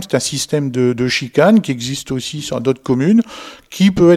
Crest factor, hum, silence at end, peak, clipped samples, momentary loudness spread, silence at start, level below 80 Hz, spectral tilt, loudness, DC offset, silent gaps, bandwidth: 14 dB; none; 0 s; 0 dBFS; under 0.1%; 11 LU; 0 s; -46 dBFS; -5.5 dB/octave; -16 LUFS; under 0.1%; none; 14.5 kHz